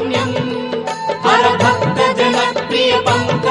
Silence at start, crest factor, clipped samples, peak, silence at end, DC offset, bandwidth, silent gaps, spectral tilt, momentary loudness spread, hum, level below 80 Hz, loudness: 0 s; 14 dB; under 0.1%; 0 dBFS; 0 s; under 0.1%; 11.5 kHz; none; -4.5 dB/octave; 9 LU; none; -50 dBFS; -15 LUFS